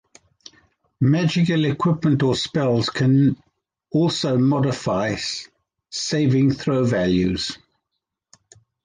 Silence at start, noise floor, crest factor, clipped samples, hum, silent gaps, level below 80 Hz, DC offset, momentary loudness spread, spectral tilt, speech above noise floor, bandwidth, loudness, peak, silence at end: 1 s; -80 dBFS; 14 dB; under 0.1%; none; none; -50 dBFS; under 0.1%; 9 LU; -6 dB/octave; 61 dB; 9.8 kHz; -20 LUFS; -8 dBFS; 1.3 s